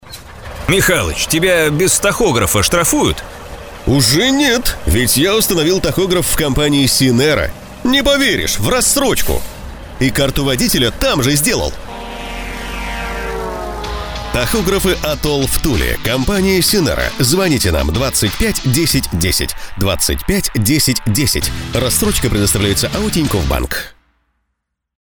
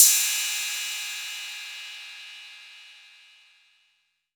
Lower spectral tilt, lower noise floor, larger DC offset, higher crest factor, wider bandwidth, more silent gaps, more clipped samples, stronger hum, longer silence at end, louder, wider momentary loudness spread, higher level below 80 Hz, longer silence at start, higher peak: first, -3.5 dB/octave vs 9.5 dB/octave; about the same, -73 dBFS vs -71 dBFS; neither; second, 14 dB vs 28 dB; about the same, over 20 kHz vs over 20 kHz; neither; neither; neither; second, 1.25 s vs 1.4 s; first, -14 LUFS vs -25 LUFS; second, 12 LU vs 22 LU; first, -26 dBFS vs under -90 dBFS; about the same, 0.05 s vs 0 s; about the same, 0 dBFS vs 0 dBFS